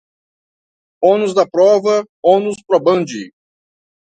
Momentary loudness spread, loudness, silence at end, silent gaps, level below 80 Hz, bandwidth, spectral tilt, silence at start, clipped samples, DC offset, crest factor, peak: 6 LU; -14 LUFS; 0.85 s; 2.09-2.23 s; -64 dBFS; 9.2 kHz; -5.5 dB/octave; 1 s; under 0.1%; under 0.1%; 16 dB; 0 dBFS